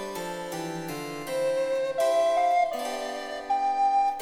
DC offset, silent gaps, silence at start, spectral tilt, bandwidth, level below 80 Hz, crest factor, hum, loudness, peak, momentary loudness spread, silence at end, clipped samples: under 0.1%; none; 0 s; -4 dB/octave; 17 kHz; -64 dBFS; 12 dB; none; -27 LUFS; -16 dBFS; 11 LU; 0 s; under 0.1%